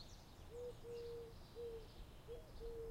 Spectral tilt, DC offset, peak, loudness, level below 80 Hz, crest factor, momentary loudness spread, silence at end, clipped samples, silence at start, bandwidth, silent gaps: -5.5 dB/octave; under 0.1%; -40 dBFS; -54 LUFS; -60 dBFS; 14 dB; 8 LU; 0 s; under 0.1%; 0 s; 16 kHz; none